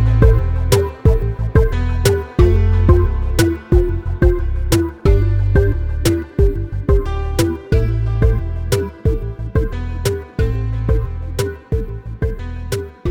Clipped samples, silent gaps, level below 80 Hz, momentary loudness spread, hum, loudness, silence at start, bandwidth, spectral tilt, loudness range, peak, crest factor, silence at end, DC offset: under 0.1%; none; -18 dBFS; 10 LU; none; -18 LUFS; 0 s; 17 kHz; -6.5 dB/octave; 6 LU; 0 dBFS; 16 dB; 0 s; 0.2%